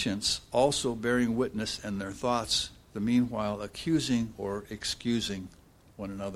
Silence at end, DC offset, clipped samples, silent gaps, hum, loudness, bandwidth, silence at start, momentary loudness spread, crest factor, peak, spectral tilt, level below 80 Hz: 0 s; under 0.1%; under 0.1%; none; none; -30 LUFS; 14.5 kHz; 0 s; 10 LU; 18 dB; -12 dBFS; -4 dB/octave; -54 dBFS